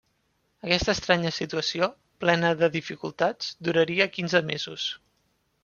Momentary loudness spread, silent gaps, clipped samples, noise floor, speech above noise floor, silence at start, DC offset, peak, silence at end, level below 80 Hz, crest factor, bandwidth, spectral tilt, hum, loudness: 9 LU; none; under 0.1%; -71 dBFS; 46 dB; 0.65 s; under 0.1%; -4 dBFS; 0.7 s; -54 dBFS; 22 dB; 7.2 kHz; -4.5 dB/octave; none; -26 LUFS